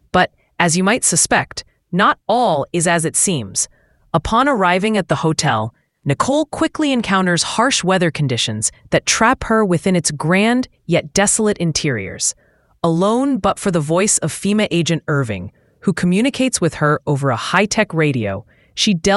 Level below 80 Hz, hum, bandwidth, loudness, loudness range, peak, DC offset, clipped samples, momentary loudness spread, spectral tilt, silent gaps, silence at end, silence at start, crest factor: -44 dBFS; none; 12 kHz; -16 LUFS; 2 LU; 0 dBFS; under 0.1%; under 0.1%; 8 LU; -4 dB/octave; none; 0 s; 0.15 s; 16 dB